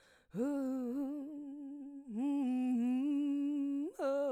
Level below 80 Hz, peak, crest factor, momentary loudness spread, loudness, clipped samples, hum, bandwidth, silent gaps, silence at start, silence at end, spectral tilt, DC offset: -80 dBFS; -24 dBFS; 12 dB; 13 LU; -37 LUFS; under 0.1%; none; 10 kHz; none; 0.35 s; 0 s; -7 dB/octave; under 0.1%